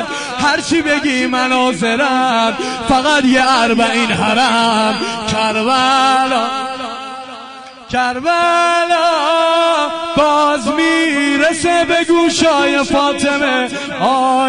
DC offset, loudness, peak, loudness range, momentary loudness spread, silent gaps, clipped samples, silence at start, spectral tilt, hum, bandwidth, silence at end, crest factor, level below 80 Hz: under 0.1%; -13 LUFS; -2 dBFS; 3 LU; 8 LU; none; under 0.1%; 0 s; -3 dB/octave; none; 10.5 kHz; 0 s; 10 dB; -46 dBFS